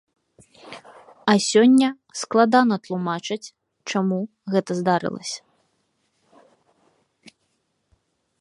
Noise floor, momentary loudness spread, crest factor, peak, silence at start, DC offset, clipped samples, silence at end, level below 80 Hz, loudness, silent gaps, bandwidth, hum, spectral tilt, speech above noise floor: -71 dBFS; 22 LU; 22 dB; -2 dBFS; 0.65 s; under 0.1%; under 0.1%; 1.1 s; -72 dBFS; -21 LUFS; none; 11.5 kHz; none; -5 dB/octave; 51 dB